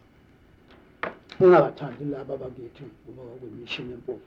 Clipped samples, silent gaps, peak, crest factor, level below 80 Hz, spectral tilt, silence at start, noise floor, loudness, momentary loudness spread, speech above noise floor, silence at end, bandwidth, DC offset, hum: under 0.1%; none; -6 dBFS; 22 dB; -60 dBFS; -8 dB/octave; 1.05 s; -56 dBFS; -24 LUFS; 26 LU; 31 dB; 0.05 s; 6 kHz; under 0.1%; none